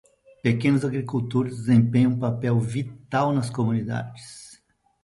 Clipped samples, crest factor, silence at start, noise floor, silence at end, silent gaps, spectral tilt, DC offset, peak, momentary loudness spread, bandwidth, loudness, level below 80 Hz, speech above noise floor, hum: under 0.1%; 16 dB; 0.45 s; -58 dBFS; 0.5 s; none; -7.5 dB/octave; under 0.1%; -6 dBFS; 11 LU; 11.5 kHz; -24 LUFS; -58 dBFS; 35 dB; none